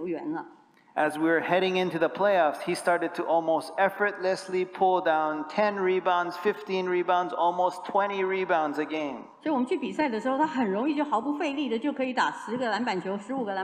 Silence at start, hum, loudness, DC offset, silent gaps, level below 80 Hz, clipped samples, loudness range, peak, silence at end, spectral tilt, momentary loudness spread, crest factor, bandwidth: 0 s; none; -27 LUFS; under 0.1%; none; -76 dBFS; under 0.1%; 2 LU; -10 dBFS; 0 s; -5.5 dB/octave; 7 LU; 18 dB; 15 kHz